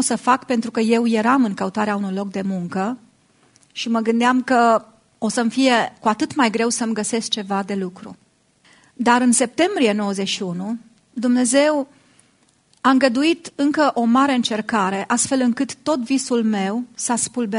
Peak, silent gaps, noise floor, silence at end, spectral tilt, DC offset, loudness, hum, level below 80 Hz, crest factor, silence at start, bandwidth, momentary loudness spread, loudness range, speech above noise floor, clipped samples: 0 dBFS; none; -59 dBFS; 0 s; -3.5 dB/octave; under 0.1%; -19 LUFS; none; -66 dBFS; 20 dB; 0 s; 11 kHz; 9 LU; 3 LU; 40 dB; under 0.1%